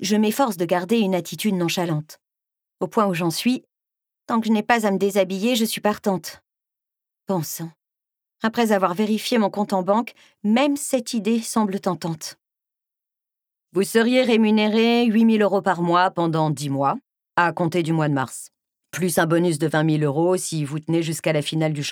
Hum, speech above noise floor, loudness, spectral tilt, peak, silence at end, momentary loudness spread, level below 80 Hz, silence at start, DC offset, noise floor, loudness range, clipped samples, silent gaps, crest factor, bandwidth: none; 66 dB; -21 LUFS; -5 dB/octave; -4 dBFS; 0 s; 10 LU; -70 dBFS; 0 s; under 0.1%; -87 dBFS; 6 LU; under 0.1%; none; 18 dB; 19.5 kHz